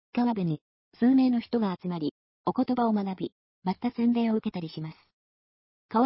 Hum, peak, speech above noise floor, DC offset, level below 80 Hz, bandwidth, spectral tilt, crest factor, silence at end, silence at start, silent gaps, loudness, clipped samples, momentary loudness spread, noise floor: none; -14 dBFS; over 63 dB; under 0.1%; -68 dBFS; 5.8 kHz; -11.5 dB/octave; 14 dB; 0 s; 0.15 s; 0.61-0.92 s, 2.11-2.44 s, 3.32-3.62 s, 5.13-5.89 s; -28 LUFS; under 0.1%; 13 LU; under -90 dBFS